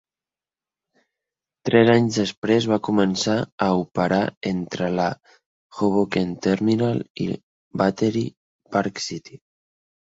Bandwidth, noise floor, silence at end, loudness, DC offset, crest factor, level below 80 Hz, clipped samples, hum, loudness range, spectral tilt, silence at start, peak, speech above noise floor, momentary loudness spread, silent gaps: 8 kHz; under -90 dBFS; 0.75 s; -22 LUFS; under 0.1%; 22 dB; -56 dBFS; under 0.1%; none; 4 LU; -6 dB/octave; 1.65 s; -2 dBFS; over 69 dB; 12 LU; 2.37-2.42 s, 3.52-3.58 s, 4.37-4.41 s, 5.46-5.70 s, 7.10-7.15 s, 7.43-7.71 s, 8.37-8.59 s